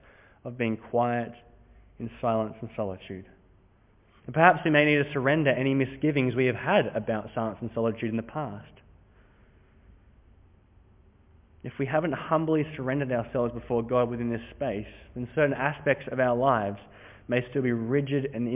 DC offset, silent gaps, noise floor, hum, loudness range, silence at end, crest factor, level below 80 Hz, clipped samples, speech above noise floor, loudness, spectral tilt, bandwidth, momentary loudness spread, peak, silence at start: under 0.1%; none; -61 dBFS; none; 11 LU; 0 s; 26 dB; -56 dBFS; under 0.1%; 34 dB; -27 LUFS; -10.5 dB/octave; 3.8 kHz; 16 LU; -4 dBFS; 0.45 s